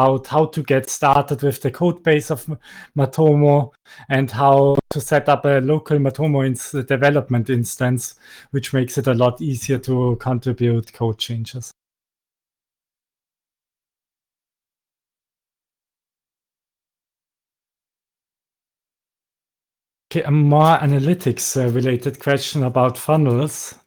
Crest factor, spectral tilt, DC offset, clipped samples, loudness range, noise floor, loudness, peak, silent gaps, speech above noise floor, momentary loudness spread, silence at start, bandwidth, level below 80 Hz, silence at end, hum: 18 dB; -6 dB/octave; under 0.1%; under 0.1%; 8 LU; under -90 dBFS; -18 LUFS; -2 dBFS; none; over 72 dB; 10 LU; 0 s; over 20 kHz; -56 dBFS; 0.15 s; none